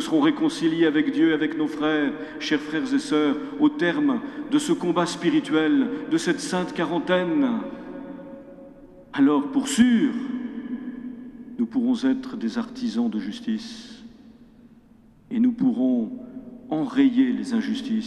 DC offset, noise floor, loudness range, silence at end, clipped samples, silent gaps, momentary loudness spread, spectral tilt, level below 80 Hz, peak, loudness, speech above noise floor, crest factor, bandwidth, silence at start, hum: under 0.1%; -53 dBFS; 5 LU; 0 s; under 0.1%; none; 16 LU; -5 dB/octave; -60 dBFS; -6 dBFS; -23 LUFS; 31 dB; 18 dB; 12 kHz; 0 s; none